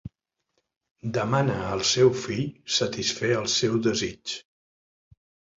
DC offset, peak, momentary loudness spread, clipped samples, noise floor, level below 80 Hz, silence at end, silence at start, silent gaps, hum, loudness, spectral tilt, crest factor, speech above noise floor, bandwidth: under 0.1%; -8 dBFS; 12 LU; under 0.1%; -77 dBFS; -56 dBFS; 1.15 s; 0.05 s; 0.77-0.81 s, 0.91-0.96 s; none; -25 LUFS; -4 dB/octave; 20 dB; 52 dB; 7.8 kHz